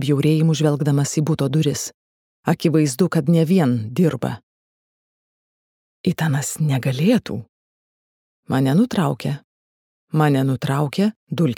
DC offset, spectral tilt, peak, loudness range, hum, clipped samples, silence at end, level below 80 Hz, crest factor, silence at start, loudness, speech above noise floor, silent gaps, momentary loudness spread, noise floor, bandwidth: under 0.1%; -6.5 dB/octave; -2 dBFS; 4 LU; none; under 0.1%; 0 s; -60 dBFS; 18 dB; 0 s; -19 LUFS; over 72 dB; 1.94-2.43 s, 4.43-6.04 s, 7.49-8.43 s, 9.44-10.07 s, 11.16-11.27 s; 10 LU; under -90 dBFS; 17 kHz